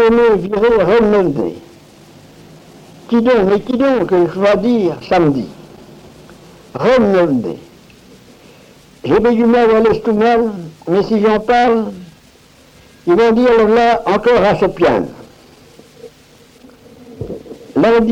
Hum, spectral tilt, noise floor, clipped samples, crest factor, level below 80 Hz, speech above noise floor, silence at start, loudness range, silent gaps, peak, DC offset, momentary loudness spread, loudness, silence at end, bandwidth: none; -7 dB/octave; -45 dBFS; under 0.1%; 12 dB; -42 dBFS; 33 dB; 0 s; 5 LU; none; -2 dBFS; under 0.1%; 16 LU; -13 LUFS; 0 s; 9.6 kHz